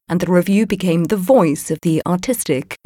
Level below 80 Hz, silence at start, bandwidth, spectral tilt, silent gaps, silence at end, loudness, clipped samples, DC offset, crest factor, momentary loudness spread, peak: -50 dBFS; 0.1 s; 17 kHz; -6 dB/octave; none; 0.1 s; -17 LUFS; under 0.1%; under 0.1%; 14 dB; 6 LU; -2 dBFS